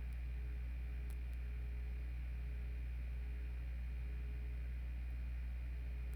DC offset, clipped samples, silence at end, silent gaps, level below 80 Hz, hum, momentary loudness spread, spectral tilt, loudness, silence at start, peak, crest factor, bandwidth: under 0.1%; under 0.1%; 0 s; none; -44 dBFS; none; 0 LU; -7.5 dB/octave; -47 LUFS; 0 s; -34 dBFS; 8 dB; 4.9 kHz